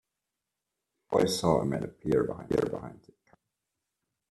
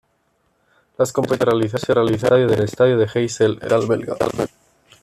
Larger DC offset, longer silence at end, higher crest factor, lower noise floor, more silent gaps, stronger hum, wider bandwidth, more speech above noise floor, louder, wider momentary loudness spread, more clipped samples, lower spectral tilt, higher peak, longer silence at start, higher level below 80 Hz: neither; first, 1.35 s vs 0.55 s; first, 22 dB vs 16 dB; first, -87 dBFS vs -65 dBFS; neither; neither; about the same, 13 kHz vs 14 kHz; first, 58 dB vs 48 dB; second, -29 LUFS vs -18 LUFS; about the same, 9 LU vs 7 LU; neither; about the same, -5.5 dB/octave vs -6 dB/octave; second, -10 dBFS vs -4 dBFS; about the same, 1.1 s vs 1 s; second, -58 dBFS vs -52 dBFS